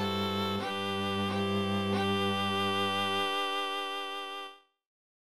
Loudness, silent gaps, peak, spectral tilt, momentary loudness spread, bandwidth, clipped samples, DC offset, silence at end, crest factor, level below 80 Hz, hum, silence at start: -31 LUFS; none; -18 dBFS; -5 dB/octave; 7 LU; 14 kHz; under 0.1%; 0.2%; 0.5 s; 14 dB; -74 dBFS; none; 0 s